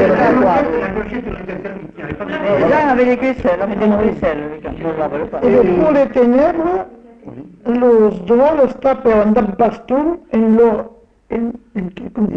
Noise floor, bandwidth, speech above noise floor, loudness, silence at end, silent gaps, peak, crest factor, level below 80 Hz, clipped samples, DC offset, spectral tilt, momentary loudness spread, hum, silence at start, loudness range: -34 dBFS; 6.8 kHz; 20 dB; -15 LUFS; 0 s; none; -2 dBFS; 12 dB; -40 dBFS; under 0.1%; under 0.1%; -8.5 dB/octave; 14 LU; none; 0 s; 2 LU